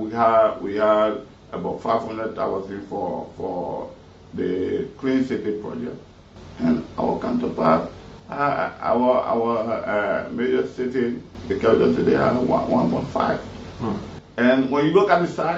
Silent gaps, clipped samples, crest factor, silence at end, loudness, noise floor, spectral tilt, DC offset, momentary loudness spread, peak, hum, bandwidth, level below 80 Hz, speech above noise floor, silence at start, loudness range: none; under 0.1%; 20 dB; 0 s; -22 LUFS; -43 dBFS; -7.5 dB/octave; under 0.1%; 14 LU; -2 dBFS; none; 7.8 kHz; -50 dBFS; 21 dB; 0 s; 6 LU